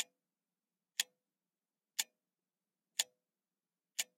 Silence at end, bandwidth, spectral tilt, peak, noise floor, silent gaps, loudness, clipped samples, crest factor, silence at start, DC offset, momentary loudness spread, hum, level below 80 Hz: 0.15 s; 16 kHz; 5 dB/octave; -14 dBFS; under -90 dBFS; none; -41 LUFS; under 0.1%; 34 dB; 0 s; under 0.1%; 6 LU; none; under -90 dBFS